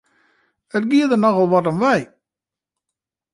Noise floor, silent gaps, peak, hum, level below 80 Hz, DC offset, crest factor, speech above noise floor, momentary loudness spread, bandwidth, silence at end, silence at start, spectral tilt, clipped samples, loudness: -88 dBFS; none; -4 dBFS; none; -64 dBFS; under 0.1%; 16 dB; 72 dB; 9 LU; 11.5 kHz; 1.3 s; 0.75 s; -7 dB/octave; under 0.1%; -17 LUFS